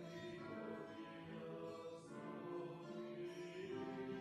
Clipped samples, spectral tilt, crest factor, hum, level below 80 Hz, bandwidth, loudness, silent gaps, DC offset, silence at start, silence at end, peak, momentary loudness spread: under 0.1%; -6.5 dB/octave; 12 dB; none; -82 dBFS; 12.5 kHz; -51 LUFS; none; under 0.1%; 0 s; 0 s; -38 dBFS; 5 LU